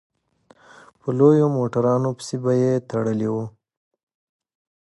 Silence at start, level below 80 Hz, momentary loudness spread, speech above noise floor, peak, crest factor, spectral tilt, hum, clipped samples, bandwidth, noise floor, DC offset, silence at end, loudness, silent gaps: 1.05 s; -64 dBFS; 12 LU; 38 dB; -2 dBFS; 20 dB; -8 dB/octave; none; under 0.1%; 11.5 kHz; -57 dBFS; under 0.1%; 1.45 s; -21 LUFS; none